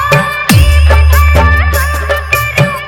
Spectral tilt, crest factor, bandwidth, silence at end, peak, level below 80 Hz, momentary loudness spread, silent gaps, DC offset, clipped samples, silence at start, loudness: -5 dB/octave; 8 dB; 18.5 kHz; 0 s; 0 dBFS; -10 dBFS; 5 LU; none; under 0.1%; 0.9%; 0 s; -9 LUFS